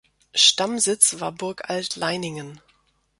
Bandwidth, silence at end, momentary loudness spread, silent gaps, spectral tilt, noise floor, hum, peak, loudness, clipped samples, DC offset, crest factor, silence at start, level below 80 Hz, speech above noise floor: 12 kHz; 0.65 s; 16 LU; none; -1 dB/octave; -64 dBFS; none; 0 dBFS; -20 LUFS; under 0.1%; under 0.1%; 24 dB; 0.35 s; -66 dBFS; 41 dB